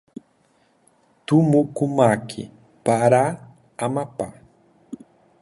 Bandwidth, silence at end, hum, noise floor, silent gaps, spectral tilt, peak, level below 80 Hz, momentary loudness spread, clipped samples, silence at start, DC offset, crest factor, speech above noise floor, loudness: 11.5 kHz; 0.45 s; none; -61 dBFS; none; -7 dB/octave; -2 dBFS; -60 dBFS; 24 LU; under 0.1%; 1.3 s; under 0.1%; 22 dB; 42 dB; -20 LUFS